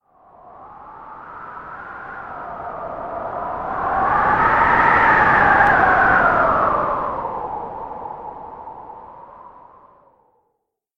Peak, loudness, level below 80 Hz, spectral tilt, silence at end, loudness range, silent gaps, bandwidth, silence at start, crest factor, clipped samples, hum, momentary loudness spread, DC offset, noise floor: -2 dBFS; -16 LUFS; -42 dBFS; -7 dB/octave; 1.5 s; 19 LU; none; 8.4 kHz; 0.45 s; 18 dB; under 0.1%; none; 23 LU; under 0.1%; -73 dBFS